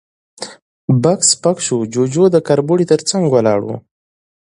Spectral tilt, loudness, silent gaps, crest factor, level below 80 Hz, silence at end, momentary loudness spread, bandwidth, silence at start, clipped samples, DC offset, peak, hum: -5 dB/octave; -14 LUFS; 0.62-0.88 s; 16 dB; -56 dBFS; 0.6 s; 18 LU; 11 kHz; 0.4 s; under 0.1%; under 0.1%; 0 dBFS; none